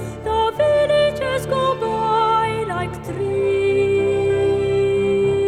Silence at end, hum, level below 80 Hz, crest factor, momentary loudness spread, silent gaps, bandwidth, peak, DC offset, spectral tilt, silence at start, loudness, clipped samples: 0 s; none; -42 dBFS; 12 dB; 6 LU; none; 13.5 kHz; -6 dBFS; under 0.1%; -6 dB/octave; 0 s; -19 LUFS; under 0.1%